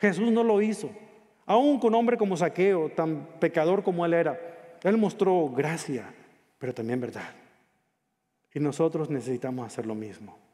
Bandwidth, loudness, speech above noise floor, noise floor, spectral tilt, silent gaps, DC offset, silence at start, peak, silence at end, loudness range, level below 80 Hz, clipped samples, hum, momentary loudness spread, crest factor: 13 kHz; -26 LUFS; 52 dB; -78 dBFS; -6.5 dB/octave; none; under 0.1%; 0 s; -8 dBFS; 0.2 s; 8 LU; -78 dBFS; under 0.1%; none; 15 LU; 18 dB